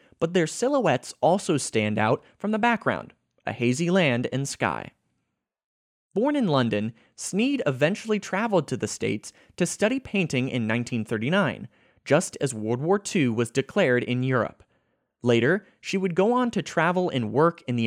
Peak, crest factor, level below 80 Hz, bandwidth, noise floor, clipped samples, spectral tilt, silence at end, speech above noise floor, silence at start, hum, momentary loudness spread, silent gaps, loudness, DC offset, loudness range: -6 dBFS; 18 dB; -66 dBFS; 15.5 kHz; -79 dBFS; under 0.1%; -5.5 dB/octave; 0 s; 55 dB; 0.2 s; none; 7 LU; 5.64-6.09 s; -25 LUFS; under 0.1%; 2 LU